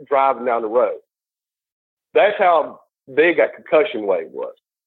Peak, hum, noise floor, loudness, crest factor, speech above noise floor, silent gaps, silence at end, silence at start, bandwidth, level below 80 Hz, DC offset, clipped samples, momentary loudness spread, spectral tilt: -4 dBFS; none; under -90 dBFS; -18 LUFS; 16 dB; over 73 dB; 1.72-1.97 s; 0.35 s; 0 s; 4.2 kHz; -76 dBFS; under 0.1%; under 0.1%; 15 LU; -8 dB/octave